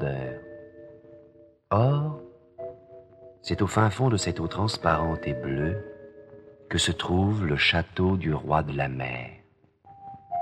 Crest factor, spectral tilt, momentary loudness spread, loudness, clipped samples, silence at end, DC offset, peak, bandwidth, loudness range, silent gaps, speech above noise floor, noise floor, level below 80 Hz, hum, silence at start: 22 dB; -5.5 dB/octave; 21 LU; -26 LUFS; under 0.1%; 0 s; under 0.1%; -6 dBFS; 12.5 kHz; 4 LU; none; 33 dB; -59 dBFS; -46 dBFS; none; 0 s